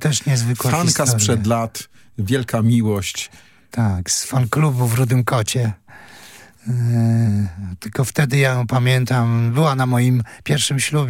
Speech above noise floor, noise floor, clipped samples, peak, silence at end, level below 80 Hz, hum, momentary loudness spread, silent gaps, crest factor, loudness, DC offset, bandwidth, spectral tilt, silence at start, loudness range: 26 dB; -43 dBFS; under 0.1%; -2 dBFS; 0 s; -54 dBFS; none; 10 LU; none; 16 dB; -18 LUFS; under 0.1%; 17 kHz; -5 dB/octave; 0 s; 3 LU